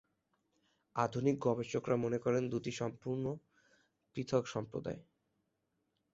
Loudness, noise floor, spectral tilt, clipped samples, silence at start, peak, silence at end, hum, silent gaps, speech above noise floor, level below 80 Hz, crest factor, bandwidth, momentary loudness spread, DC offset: -37 LUFS; -83 dBFS; -6.5 dB/octave; under 0.1%; 0.95 s; -18 dBFS; 1.1 s; none; none; 47 dB; -70 dBFS; 22 dB; 8 kHz; 11 LU; under 0.1%